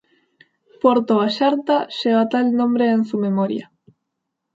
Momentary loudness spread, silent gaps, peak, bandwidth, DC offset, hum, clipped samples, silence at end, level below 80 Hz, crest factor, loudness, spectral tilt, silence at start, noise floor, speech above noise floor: 4 LU; none; -2 dBFS; 7.6 kHz; under 0.1%; none; under 0.1%; 0.95 s; -70 dBFS; 18 dB; -19 LUFS; -7 dB/octave; 0.85 s; -78 dBFS; 61 dB